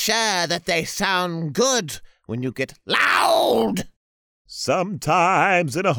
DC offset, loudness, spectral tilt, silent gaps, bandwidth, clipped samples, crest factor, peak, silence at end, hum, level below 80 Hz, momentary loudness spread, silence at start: under 0.1%; -20 LUFS; -3 dB/octave; 3.96-4.45 s; over 20 kHz; under 0.1%; 18 dB; -4 dBFS; 0 s; none; -54 dBFS; 13 LU; 0 s